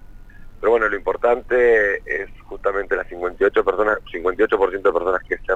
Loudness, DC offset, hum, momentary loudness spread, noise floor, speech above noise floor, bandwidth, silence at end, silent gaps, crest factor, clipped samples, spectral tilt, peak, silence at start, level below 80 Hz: -20 LUFS; under 0.1%; none; 9 LU; -38 dBFS; 19 dB; 7.8 kHz; 0 s; none; 14 dB; under 0.1%; -6 dB/octave; -6 dBFS; 0 s; -40 dBFS